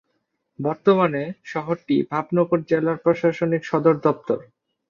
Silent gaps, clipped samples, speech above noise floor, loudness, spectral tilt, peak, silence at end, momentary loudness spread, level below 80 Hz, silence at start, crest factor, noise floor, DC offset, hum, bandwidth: none; under 0.1%; 52 dB; -22 LUFS; -8.5 dB/octave; -2 dBFS; 0.45 s; 9 LU; -64 dBFS; 0.6 s; 20 dB; -73 dBFS; under 0.1%; none; 7.2 kHz